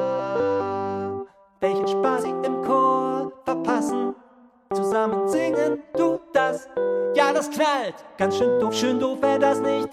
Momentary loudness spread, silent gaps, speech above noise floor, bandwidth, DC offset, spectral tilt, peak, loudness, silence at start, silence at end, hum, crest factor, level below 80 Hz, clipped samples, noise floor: 8 LU; none; 31 dB; 14.5 kHz; under 0.1%; -5 dB/octave; -6 dBFS; -23 LUFS; 0 s; 0 s; none; 18 dB; -64 dBFS; under 0.1%; -53 dBFS